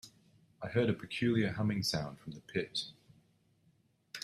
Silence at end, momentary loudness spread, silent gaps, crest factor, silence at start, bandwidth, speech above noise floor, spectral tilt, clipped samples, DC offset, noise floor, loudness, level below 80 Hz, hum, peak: 0 s; 15 LU; none; 20 dB; 0.05 s; 14.5 kHz; 37 dB; -5.5 dB/octave; under 0.1%; under 0.1%; -71 dBFS; -35 LUFS; -66 dBFS; none; -18 dBFS